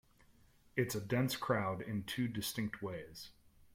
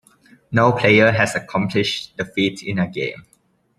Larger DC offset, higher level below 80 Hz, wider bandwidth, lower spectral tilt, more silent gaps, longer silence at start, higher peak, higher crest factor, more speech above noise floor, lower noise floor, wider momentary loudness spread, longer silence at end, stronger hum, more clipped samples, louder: neither; second, -66 dBFS vs -56 dBFS; first, 16.5 kHz vs 13 kHz; about the same, -5 dB/octave vs -5.5 dB/octave; neither; first, 0.75 s vs 0.5 s; second, -20 dBFS vs -2 dBFS; about the same, 20 dB vs 18 dB; second, 28 dB vs 34 dB; first, -66 dBFS vs -52 dBFS; about the same, 13 LU vs 12 LU; second, 0.4 s vs 0.6 s; neither; neither; second, -38 LUFS vs -18 LUFS